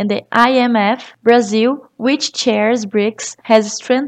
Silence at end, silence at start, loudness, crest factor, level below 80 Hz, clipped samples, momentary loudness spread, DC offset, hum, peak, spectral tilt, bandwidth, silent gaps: 0 s; 0 s; -15 LUFS; 14 dB; -64 dBFS; 0.1%; 6 LU; under 0.1%; none; 0 dBFS; -4 dB/octave; 9.4 kHz; none